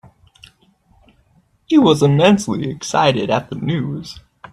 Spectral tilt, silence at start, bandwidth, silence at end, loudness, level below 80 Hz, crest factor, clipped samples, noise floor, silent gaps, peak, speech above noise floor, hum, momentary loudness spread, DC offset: -6 dB/octave; 1.7 s; 13 kHz; 0.35 s; -16 LUFS; -52 dBFS; 18 dB; under 0.1%; -57 dBFS; none; 0 dBFS; 41 dB; none; 15 LU; under 0.1%